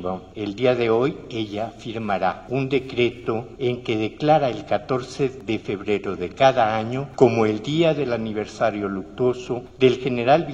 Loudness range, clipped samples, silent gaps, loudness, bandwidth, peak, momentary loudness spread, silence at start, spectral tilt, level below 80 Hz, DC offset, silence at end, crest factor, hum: 3 LU; under 0.1%; none; -22 LUFS; 8.2 kHz; 0 dBFS; 10 LU; 0 s; -6.5 dB/octave; -52 dBFS; under 0.1%; 0 s; 22 dB; none